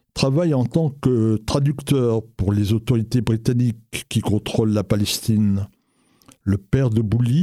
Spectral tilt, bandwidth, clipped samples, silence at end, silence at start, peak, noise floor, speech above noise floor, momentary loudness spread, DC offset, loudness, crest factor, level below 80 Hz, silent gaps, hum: -6.5 dB/octave; 15 kHz; under 0.1%; 0 s; 0.15 s; -2 dBFS; -60 dBFS; 41 dB; 5 LU; under 0.1%; -21 LUFS; 18 dB; -44 dBFS; none; none